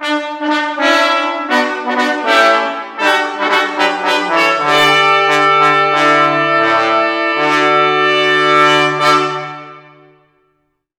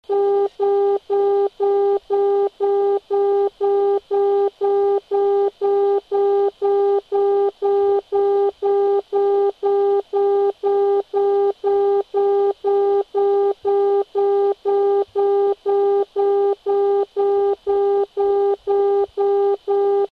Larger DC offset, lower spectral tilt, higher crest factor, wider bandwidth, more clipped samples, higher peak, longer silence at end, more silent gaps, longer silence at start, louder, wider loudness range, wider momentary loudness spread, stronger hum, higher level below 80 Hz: neither; second, -3.5 dB/octave vs -6.5 dB/octave; first, 14 dB vs 8 dB; first, 19 kHz vs 4.7 kHz; neither; first, 0 dBFS vs -10 dBFS; first, 1.2 s vs 0.05 s; neither; about the same, 0 s vs 0.1 s; first, -11 LUFS vs -19 LUFS; first, 3 LU vs 0 LU; first, 7 LU vs 2 LU; neither; about the same, -62 dBFS vs -64 dBFS